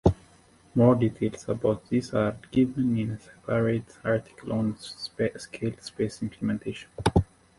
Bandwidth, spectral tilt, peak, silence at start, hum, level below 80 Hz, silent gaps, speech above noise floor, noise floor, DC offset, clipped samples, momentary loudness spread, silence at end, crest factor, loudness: 11.5 kHz; -7.5 dB/octave; -6 dBFS; 0.05 s; none; -44 dBFS; none; 31 dB; -57 dBFS; under 0.1%; under 0.1%; 10 LU; 0.35 s; 22 dB; -28 LUFS